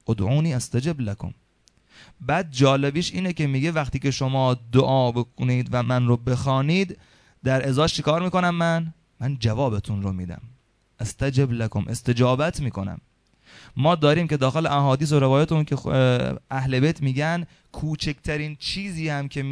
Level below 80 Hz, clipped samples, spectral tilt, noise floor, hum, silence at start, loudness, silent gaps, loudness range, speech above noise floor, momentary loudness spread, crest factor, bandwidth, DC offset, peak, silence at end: -46 dBFS; under 0.1%; -6.5 dB/octave; -60 dBFS; none; 0.1 s; -23 LUFS; none; 4 LU; 38 dB; 11 LU; 20 dB; 11 kHz; under 0.1%; -2 dBFS; 0 s